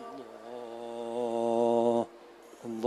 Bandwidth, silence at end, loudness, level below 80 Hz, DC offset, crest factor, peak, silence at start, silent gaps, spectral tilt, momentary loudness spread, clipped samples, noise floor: 12 kHz; 0 s; -31 LUFS; -78 dBFS; under 0.1%; 18 dB; -14 dBFS; 0 s; none; -6.5 dB/octave; 19 LU; under 0.1%; -52 dBFS